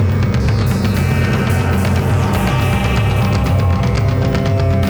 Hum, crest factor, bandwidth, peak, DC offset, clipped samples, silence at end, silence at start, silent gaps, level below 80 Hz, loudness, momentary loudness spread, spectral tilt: none; 12 dB; over 20 kHz; -2 dBFS; under 0.1%; under 0.1%; 0 s; 0 s; none; -26 dBFS; -15 LUFS; 1 LU; -7 dB/octave